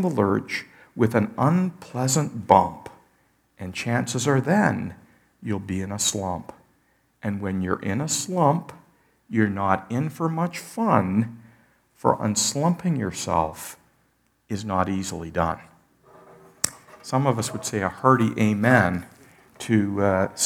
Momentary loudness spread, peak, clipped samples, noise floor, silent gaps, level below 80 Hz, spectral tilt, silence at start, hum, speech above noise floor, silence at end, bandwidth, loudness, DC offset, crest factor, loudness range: 13 LU; -2 dBFS; under 0.1%; -66 dBFS; none; -56 dBFS; -5 dB/octave; 0 s; none; 43 dB; 0 s; 18.5 kHz; -24 LUFS; under 0.1%; 24 dB; 5 LU